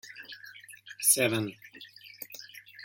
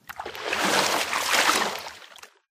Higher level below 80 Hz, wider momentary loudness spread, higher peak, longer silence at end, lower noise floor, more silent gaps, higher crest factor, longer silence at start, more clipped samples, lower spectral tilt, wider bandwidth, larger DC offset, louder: second, -76 dBFS vs -64 dBFS; first, 24 LU vs 17 LU; second, -10 dBFS vs -6 dBFS; second, 0 s vs 0.25 s; about the same, -51 dBFS vs -48 dBFS; neither; about the same, 24 dB vs 20 dB; about the same, 0.05 s vs 0.1 s; neither; first, -2.5 dB/octave vs -0.5 dB/octave; about the same, 17 kHz vs 15.5 kHz; neither; second, -26 LUFS vs -23 LUFS